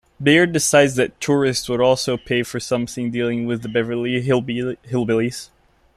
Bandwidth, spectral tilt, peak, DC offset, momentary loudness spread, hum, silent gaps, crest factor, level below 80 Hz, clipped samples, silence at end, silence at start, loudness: 15 kHz; -4.5 dB/octave; -2 dBFS; under 0.1%; 9 LU; none; none; 18 dB; -52 dBFS; under 0.1%; 0.5 s; 0.2 s; -19 LUFS